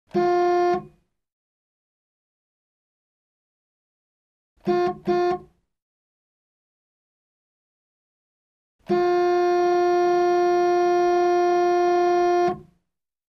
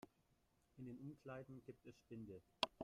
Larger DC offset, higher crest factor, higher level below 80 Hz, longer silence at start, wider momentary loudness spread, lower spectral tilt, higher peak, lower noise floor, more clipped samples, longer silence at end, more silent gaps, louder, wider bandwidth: neither; second, 12 dB vs 34 dB; first, -62 dBFS vs -80 dBFS; about the same, 0.15 s vs 0.05 s; second, 6 LU vs 15 LU; first, -6 dB/octave vs -4.5 dB/octave; first, -12 dBFS vs -20 dBFS; about the same, -79 dBFS vs -81 dBFS; neither; first, 0.7 s vs 0 s; first, 1.32-4.56 s, 5.82-8.79 s vs none; first, -21 LUFS vs -54 LUFS; second, 6.4 kHz vs 14 kHz